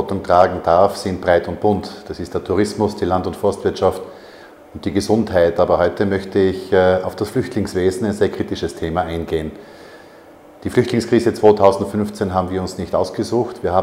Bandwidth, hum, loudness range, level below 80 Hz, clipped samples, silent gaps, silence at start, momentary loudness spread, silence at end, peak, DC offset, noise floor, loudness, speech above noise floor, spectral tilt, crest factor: 16 kHz; none; 4 LU; -48 dBFS; under 0.1%; none; 0 s; 9 LU; 0 s; 0 dBFS; under 0.1%; -43 dBFS; -18 LUFS; 25 dB; -6.5 dB/octave; 18 dB